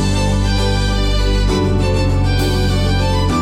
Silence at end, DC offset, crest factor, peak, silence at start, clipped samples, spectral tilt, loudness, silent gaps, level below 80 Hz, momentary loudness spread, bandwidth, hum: 0 s; under 0.1%; 10 dB; -6 dBFS; 0 s; under 0.1%; -5.5 dB/octave; -16 LUFS; none; -18 dBFS; 1 LU; 14.5 kHz; none